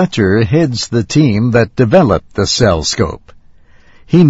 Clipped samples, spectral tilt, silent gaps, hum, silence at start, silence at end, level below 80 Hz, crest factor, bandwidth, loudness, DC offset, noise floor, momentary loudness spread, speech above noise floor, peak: 0.3%; -5.5 dB/octave; none; none; 0 s; 0 s; -34 dBFS; 12 dB; 8 kHz; -12 LUFS; under 0.1%; -42 dBFS; 6 LU; 30 dB; 0 dBFS